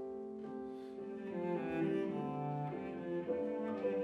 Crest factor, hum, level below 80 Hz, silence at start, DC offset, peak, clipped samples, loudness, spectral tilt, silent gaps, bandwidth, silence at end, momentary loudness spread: 14 dB; none; -74 dBFS; 0 s; under 0.1%; -26 dBFS; under 0.1%; -41 LUFS; -9 dB/octave; none; 8 kHz; 0 s; 9 LU